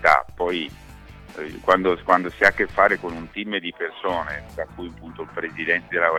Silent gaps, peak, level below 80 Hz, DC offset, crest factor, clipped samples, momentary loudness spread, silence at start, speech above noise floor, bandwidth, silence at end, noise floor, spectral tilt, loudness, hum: none; -2 dBFS; -48 dBFS; under 0.1%; 20 dB; under 0.1%; 16 LU; 0 s; 20 dB; 18.5 kHz; 0 s; -43 dBFS; -5 dB/octave; -22 LUFS; none